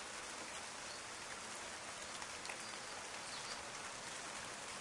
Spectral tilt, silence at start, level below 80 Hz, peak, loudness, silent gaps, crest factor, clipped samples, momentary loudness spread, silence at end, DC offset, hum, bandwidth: -0.5 dB/octave; 0 s; -74 dBFS; -28 dBFS; -46 LUFS; none; 20 dB; under 0.1%; 1 LU; 0 s; under 0.1%; none; 12 kHz